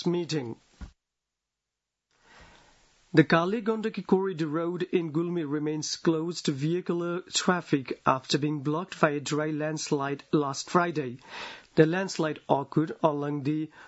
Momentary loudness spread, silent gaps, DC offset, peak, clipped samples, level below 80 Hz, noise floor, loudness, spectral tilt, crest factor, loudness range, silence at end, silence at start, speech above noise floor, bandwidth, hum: 7 LU; none; under 0.1%; -6 dBFS; under 0.1%; -64 dBFS; -87 dBFS; -28 LUFS; -5.5 dB/octave; 24 dB; 2 LU; 0 s; 0 s; 59 dB; 8 kHz; none